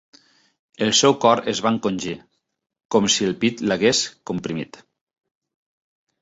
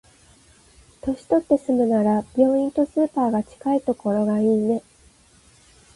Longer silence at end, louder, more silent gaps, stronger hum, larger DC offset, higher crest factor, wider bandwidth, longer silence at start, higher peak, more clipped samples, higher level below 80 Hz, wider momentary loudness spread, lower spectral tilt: first, 1.55 s vs 1.15 s; about the same, -20 LUFS vs -21 LUFS; first, 2.85-2.89 s vs none; neither; neither; about the same, 22 dB vs 18 dB; second, 8 kHz vs 11.5 kHz; second, 0.8 s vs 1.05 s; first, -2 dBFS vs -6 dBFS; neither; about the same, -60 dBFS vs -56 dBFS; first, 14 LU vs 6 LU; second, -3.5 dB/octave vs -8 dB/octave